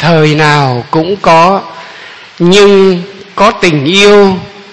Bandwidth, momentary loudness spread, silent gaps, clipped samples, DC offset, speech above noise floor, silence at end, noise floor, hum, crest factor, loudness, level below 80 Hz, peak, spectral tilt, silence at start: 11 kHz; 17 LU; none; 4%; under 0.1%; 24 dB; 0 s; -30 dBFS; none; 8 dB; -7 LUFS; -40 dBFS; 0 dBFS; -5.5 dB/octave; 0 s